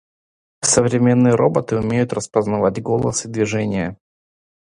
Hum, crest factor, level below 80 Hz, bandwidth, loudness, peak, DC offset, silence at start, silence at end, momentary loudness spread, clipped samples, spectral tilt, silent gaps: none; 18 dB; -48 dBFS; 11 kHz; -18 LUFS; 0 dBFS; under 0.1%; 0.6 s; 0.85 s; 7 LU; under 0.1%; -5 dB/octave; none